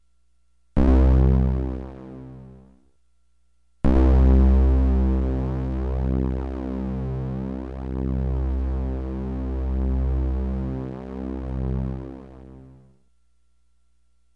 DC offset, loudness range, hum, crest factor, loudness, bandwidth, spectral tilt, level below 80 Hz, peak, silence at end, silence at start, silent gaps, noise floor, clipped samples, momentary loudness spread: 0.1%; 9 LU; 60 Hz at -60 dBFS; 18 dB; -24 LUFS; 3.8 kHz; -10.5 dB/octave; -24 dBFS; -6 dBFS; 1.7 s; 0.75 s; none; -68 dBFS; under 0.1%; 16 LU